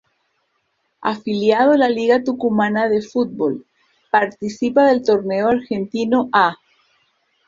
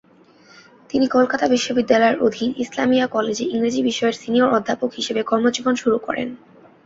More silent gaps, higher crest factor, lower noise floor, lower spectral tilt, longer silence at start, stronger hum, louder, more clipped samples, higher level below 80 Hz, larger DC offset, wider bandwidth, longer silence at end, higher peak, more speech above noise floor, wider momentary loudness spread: neither; about the same, 18 dB vs 18 dB; first, -69 dBFS vs -51 dBFS; first, -6 dB/octave vs -4 dB/octave; about the same, 1 s vs 0.95 s; neither; about the same, -18 LUFS vs -19 LUFS; neither; about the same, -60 dBFS vs -60 dBFS; neither; about the same, 7.6 kHz vs 7.8 kHz; first, 0.95 s vs 0.5 s; about the same, -2 dBFS vs -2 dBFS; first, 52 dB vs 32 dB; about the same, 9 LU vs 7 LU